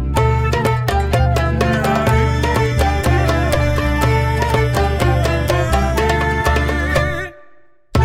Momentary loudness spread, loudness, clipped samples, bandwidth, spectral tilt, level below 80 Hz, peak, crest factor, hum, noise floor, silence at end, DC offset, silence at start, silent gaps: 2 LU; -16 LUFS; under 0.1%; 16 kHz; -6 dB/octave; -22 dBFS; -4 dBFS; 12 dB; none; -49 dBFS; 0 s; under 0.1%; 0 s; none